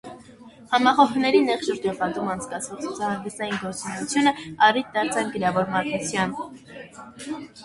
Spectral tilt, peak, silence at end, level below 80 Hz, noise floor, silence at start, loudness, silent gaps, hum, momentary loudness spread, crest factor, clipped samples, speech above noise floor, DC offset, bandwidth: -4 dB/octave; -4 dBFS; 0 s; -60 dBFS; -47 dBFS; 0.05 s; -23 LUFS; none; none; 17 LU; 20 dB; under 0.1%; 23 dB; under 0.1%; 11.5 kHz